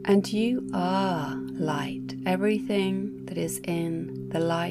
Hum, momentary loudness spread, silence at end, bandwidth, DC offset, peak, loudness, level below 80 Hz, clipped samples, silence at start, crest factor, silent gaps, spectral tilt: none; 7 LU; 0 s; 16 kHz; under 0.1%; -10 dBFS; -28 LUFS; -60 dBFS; under 0.1%; 0 s; 16 dB; none; -6 dB/octave